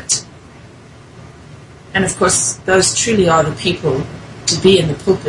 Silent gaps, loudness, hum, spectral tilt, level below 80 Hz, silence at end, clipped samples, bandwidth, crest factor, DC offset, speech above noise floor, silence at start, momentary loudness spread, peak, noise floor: none; -14 LUFS; none; -3.5 dB/octave; -44 dBFS; 0 s; under 0.1%; 11.5 kHz; 16 dB; under 0.1%; 25 dB; 0 s; 9 LU; 0 dBFS; -39 dBFS